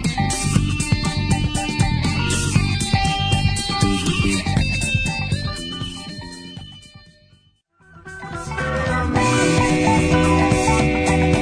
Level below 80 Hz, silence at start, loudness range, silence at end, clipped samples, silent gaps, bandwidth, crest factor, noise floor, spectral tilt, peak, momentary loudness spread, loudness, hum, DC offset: -30 dBFS; 0 s; 11 LU; 0 s; under 0.1%; none; 11 kHz; 18 dB; -57 dBFS; -5 dB/octave; -2 dBFS; 15 LU; -19 LUFS; none; under 0.1%